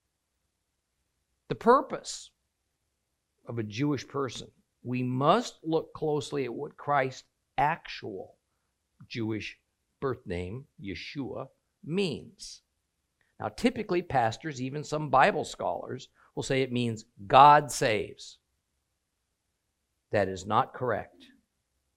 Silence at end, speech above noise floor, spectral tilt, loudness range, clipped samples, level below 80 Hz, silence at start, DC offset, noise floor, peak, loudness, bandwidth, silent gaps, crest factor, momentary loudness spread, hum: 0.9 s; 52 dB; -5 dB/octave; 11 LU; under 0.1%; -60 dBFS; 1.5 s; under 0.1%; -81 dBFS; -4 dBFS; -28 LUFS; 16 kHz; none; 28 dB; 18 LU; none